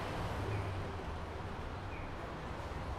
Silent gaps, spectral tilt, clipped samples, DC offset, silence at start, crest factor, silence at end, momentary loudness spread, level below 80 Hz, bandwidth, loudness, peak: none; -6.5 dB/octave; under 0.1%; under 0.1%; 0 s; 14 dB; 0 s; 5 LU; -48 dBFS; 14 kHz; -42 LUFS; -26 dBFS